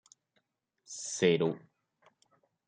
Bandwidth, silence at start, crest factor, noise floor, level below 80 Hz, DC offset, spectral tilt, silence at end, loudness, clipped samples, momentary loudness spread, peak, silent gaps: 9.6 kHz; 0.9 s; 22 dB; -79 dBFS; -80 dBFS; under 0.1%; -4.5 dB/octave; 1.1 s; -31 LUFS; under 0.1%; 18 LU; -14 dBFS; none